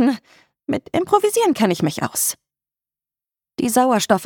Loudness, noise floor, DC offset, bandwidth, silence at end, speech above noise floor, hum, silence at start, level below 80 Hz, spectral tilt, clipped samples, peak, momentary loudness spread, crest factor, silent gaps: -19 LUFS; under -90 dBFS; under 0.1%; 19 kHz; 0 s; over 72 dB; none; 0 s; -60 dBFS; -4 dB/octave; under 0.1%; -2 dBFS; 14 LU; 18 dB; none